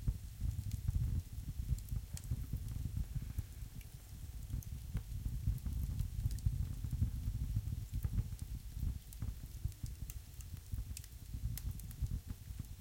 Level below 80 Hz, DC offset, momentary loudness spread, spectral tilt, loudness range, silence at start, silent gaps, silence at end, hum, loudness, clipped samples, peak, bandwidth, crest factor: -44 dBFS; under 0.1%; 10 LU; -6 dB/octave; 5 LU; 0 s; none; 0 s; none; -44 LUFS; under 0.1%; -22 dBFS; 17 kHz; 20 dB